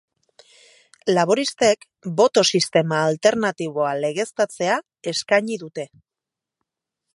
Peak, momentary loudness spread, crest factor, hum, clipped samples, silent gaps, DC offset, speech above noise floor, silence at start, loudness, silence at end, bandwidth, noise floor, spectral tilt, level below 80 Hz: -2 dBFS; 11 LU; 20 dB; none; under 0.1%; none; under 0.1%; 67 dB; 1.05 s; -20 LUFS; 1.3 s; 11.5 kHz; -87 dBFS; -4 dB/octave; -70 dBFS